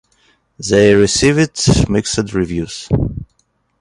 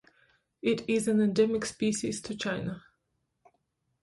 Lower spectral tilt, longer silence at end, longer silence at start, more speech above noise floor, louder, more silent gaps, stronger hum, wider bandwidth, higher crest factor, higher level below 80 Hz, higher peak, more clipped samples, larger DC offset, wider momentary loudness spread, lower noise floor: about the same, -5 dB/octave vs -5 dB/octave; second, 0.55 s vs 1.25 s; about the same, 0.6 s vs 0.65 s; about the same, 49 dB vs 51 dB; first, -14 LUFS vs -29 LUFS; neither; neither; about the same, 11.5 kHz vs 11.5 kHz; about the same, 16 dB vs 18 dB; first, -32 dBFS vs -64 dBFS; first, 0 dBFS vs -14 dBFS; neither; neither; first, 12 LU vs 9 LU; second, -62 dBFS vs -79 dBFS